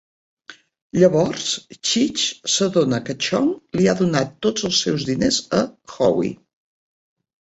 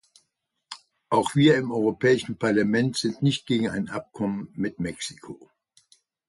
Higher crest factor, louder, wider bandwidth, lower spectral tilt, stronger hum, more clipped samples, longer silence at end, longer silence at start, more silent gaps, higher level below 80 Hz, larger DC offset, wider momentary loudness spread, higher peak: about the same, 20 dB vs 18 dB; first, -20 LUFS vs -24 LUFS; second, 8.2 kHz vs 11.5 kHz; second, -4 dB/octave vs -5.5 dB/octave; neither; neither; about the same, 1.05 s vs 0.95 s; second, 0.5 s vs 0.7 s; first, 0.82-0.90 s vs none; first, -54 dBFS vs -60 dBFS; neither; second, 6 LU vs 23 LU; first, -2 dBFS vs -6 dBFS